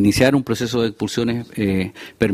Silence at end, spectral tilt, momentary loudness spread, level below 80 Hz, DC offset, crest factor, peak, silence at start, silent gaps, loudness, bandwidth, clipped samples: 0 s; -5.5 dB/octave; 7 LU; -44 dBFS; under 0.1%; 18 dB; -2 dBFS; 0 s; none; -20 LUFS; 16 kHz; under 0.1%